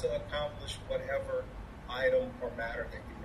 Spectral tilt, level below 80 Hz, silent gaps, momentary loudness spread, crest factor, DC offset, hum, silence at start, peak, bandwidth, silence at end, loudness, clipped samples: -5 dB/octave; -48 dBFS; none; 12 LU; 18 dB; under 0.1%; none; 0 s; -18 dBFS; 13 kHz; 0 s; -35 LUFS; under 0.1%